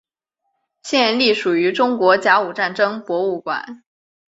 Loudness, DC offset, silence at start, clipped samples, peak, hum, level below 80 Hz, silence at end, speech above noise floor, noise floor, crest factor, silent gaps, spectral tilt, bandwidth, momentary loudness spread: -17 LUFS; under 0.1%; 0.85 s; under 0.1%; 0 dBFS; none; -68 dBFS; 0.55 s; 58 dB; -75 dBFS; 18 dB; none; -4 dB/octave; 8 kHz; 11 LU